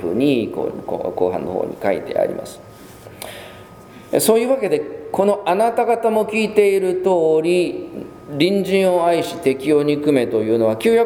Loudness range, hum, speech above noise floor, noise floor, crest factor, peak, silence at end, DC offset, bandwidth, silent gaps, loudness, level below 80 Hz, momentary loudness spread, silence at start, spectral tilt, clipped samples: 6 LU; none; 23 dB; -40 dBFS; 18 dB; 0 dBFS; 0 s; under 0.1%; 19.5 kHz; none; -18 LUFS; -56 dBFS; 15 LU; 0 s; -5 dB/octave; under 0.1%